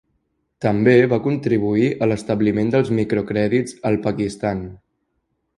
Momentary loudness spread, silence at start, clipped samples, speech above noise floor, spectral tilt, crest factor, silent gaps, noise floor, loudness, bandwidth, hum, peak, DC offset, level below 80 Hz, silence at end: 10 LU; 0.6 s; under 0.1%; 53 dB; -7.5 dB/octave; 18 dB; none; -72 dBFS; -19 LUFS; 11.5 kHz; none; -2 dBFS; under 0.1%; -50 dBFS; 0.8 s